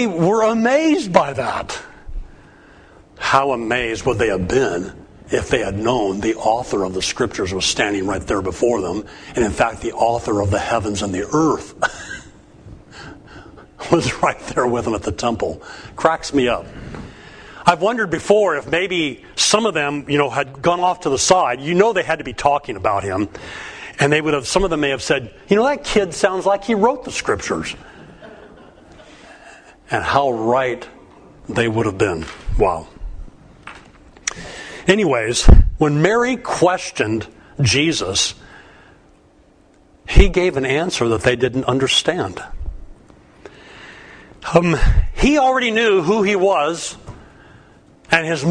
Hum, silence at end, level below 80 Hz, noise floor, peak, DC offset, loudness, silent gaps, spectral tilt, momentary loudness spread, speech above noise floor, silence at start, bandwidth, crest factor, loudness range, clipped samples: none; 0 s; -26 dBFS; -51 dBFS; 0 dBFS; under 0.1%; -18 LUFS; none; -4.5 dB/octave; 17 LU; 34 dB; 0 s; 10.5 kHz; 18 dB; 6 LU; under 0.1%